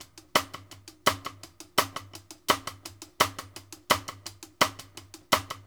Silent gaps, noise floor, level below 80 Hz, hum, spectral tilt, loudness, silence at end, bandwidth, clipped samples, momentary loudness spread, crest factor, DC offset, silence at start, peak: none; -50 dBFS; -60 dBFS; none; -2 dB/octave; -28 LUFS; 0.05 s; over 20 kHz; under 0.1%; 18 LU; 26 dB; under 0.1%; 0 s; -4 dBFS